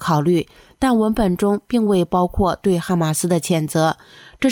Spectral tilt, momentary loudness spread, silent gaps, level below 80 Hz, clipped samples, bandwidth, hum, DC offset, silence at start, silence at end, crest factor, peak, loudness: -6 dB/octave; 4 LU; none; -38 dBFS; under 0.1%; 18 kHz; none; under 0.1%; 0 s; 0 s; 12 dB; -6 dBFS; -19 LUFS